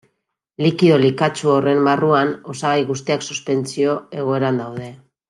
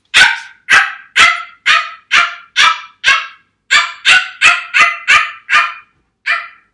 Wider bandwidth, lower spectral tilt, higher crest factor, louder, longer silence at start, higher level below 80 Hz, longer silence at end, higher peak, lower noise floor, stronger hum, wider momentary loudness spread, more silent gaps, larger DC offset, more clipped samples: about the same, 11.5 kHz vs 12 kHz; first, -6 dB/octave vs 1.5 dB/octave; about the same, 16 dB vs 12 dB; second, -18 LUFS vs -10 LUFS; first, 0.6 s vs 0.15 s; second, -64 dBFS vs -52 dBFS; about the same, 0.35 s vs 0.25 s; about the same, -2 dBFS vs 0 dBFS; first, -73 dBFS vs -42 dBFS; neither; about the same, 9 LU vs 9 LU; neither; neither; second, under 0.1% vs 0.4%